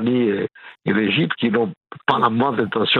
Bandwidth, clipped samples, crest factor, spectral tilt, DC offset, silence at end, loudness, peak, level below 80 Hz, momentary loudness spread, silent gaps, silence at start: 4.7 kHz; under 0.1%; 18 dB; -8 dB/octave; under 0.1%; 0 s; -20 LUFS; -2 dBFS; -64 dBFS; 8 LU; 1.77-1.81 s; 0 s